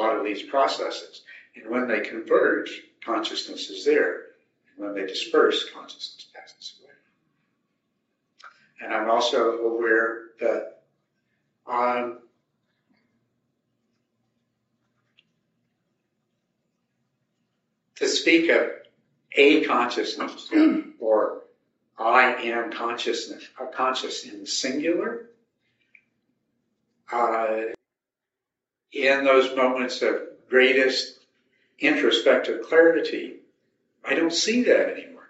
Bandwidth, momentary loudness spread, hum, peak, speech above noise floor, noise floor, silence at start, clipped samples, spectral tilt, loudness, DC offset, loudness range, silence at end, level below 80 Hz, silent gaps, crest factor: 8 kHz; 18 LU; none; -4 dBFS; 64 dB; -87 dBFS; 0 s; under 0.1%; 0 dB/octave; -23 LUFS; under 0.1%; 10 LU; 0.15 s; -84 dBFS; none; 22 dB